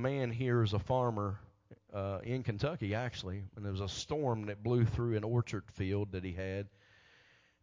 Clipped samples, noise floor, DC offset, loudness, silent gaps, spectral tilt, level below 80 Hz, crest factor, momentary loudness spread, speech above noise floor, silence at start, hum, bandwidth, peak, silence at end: under 0.1%; -66 dBFS; under 0.1%; -36 LUFS; none; -7 dB/octave; -54 dBFS; 16 dB; 10 LU; 31 dB; 0 s; none; 7.6 kHz; -20 dBFS; 0.95 s